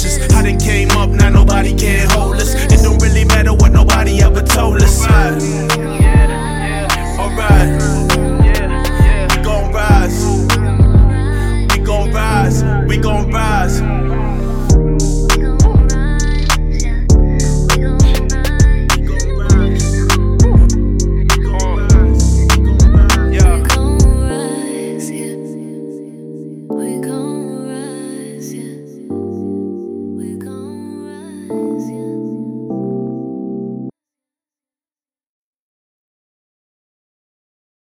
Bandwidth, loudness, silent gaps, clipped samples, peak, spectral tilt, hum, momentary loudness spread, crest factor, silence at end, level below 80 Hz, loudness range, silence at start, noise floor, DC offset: 16.5 kHz; -13 LUFS; none; under 0.1%; 0 dBFS; -5.5 dB/octave; none; 15 LU; 12 dB; 3.9 s; -14 dBFS; 13 LU; 0 s; under -90 dBFS; under 0.1%